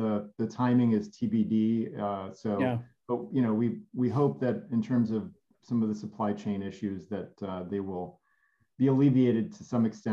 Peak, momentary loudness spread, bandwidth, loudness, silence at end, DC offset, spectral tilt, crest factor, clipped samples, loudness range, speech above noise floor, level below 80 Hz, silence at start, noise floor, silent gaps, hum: -14 dBFS; 12 LU; 7.2 kHz; -30 LUFS; 0 s; under 0.1%; -9 dB/octave; 16 dB; under 0.1%; 5 LU; 43 dB; -74 dBFS; 0 s; -72 dBFS; none; none